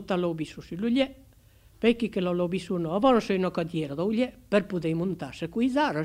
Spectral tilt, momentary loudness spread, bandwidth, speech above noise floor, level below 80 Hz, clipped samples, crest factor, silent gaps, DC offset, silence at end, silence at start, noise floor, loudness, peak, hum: -7 dB/octave; 8 LU; 15.5 kHz; 30 dB; -56 dBFS; under 0.1%; 18 dB; none; under 0.1%; 0 s; 0 s; -56 dBFS; -27 LUFS; -8 dBFS; none